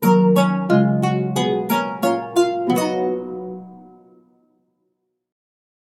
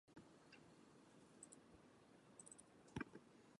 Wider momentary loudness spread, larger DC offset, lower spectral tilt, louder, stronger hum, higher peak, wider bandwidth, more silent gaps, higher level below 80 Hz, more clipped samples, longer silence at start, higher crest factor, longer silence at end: about the same, 13 LU vs 14 LU; neither; first, -6.5 dB/octave vs -4.5 dB/octave; first, -19 LUFS vs -62 LUFS; neither; first, -2 dBFS vs -36 dBFS; first, 16 kHz vs 11 kHz; neither; first, -72 dBFS vs -80 dBFS; neither; about the same, 0 s vs 0.05 s; second, 18 dB vs 26 dB; first, 2.2 s vs 0.05 s